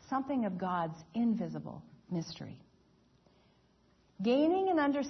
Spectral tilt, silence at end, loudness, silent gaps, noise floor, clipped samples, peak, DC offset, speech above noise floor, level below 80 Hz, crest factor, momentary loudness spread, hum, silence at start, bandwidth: -5.5 dB/octave; 0 s; -33 LUFS; none; -68 dBFS; under 0.1%; -18 dBFS; under 0.1%; 36 dB; -72 dBFS; 16 dB; 17 LU; none; 0.1 s; 6.2 kHz